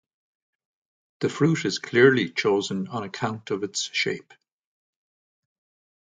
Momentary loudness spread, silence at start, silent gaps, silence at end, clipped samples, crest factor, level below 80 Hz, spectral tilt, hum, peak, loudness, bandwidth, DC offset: 12 LU; 1.2 s; none; 1.9 s; under 0.1%; 24 dB; -68 dBFS; -4.5 dB/octave; none; -4 dBFS; -24 LUFS; 9.6 kHz; under 0.1%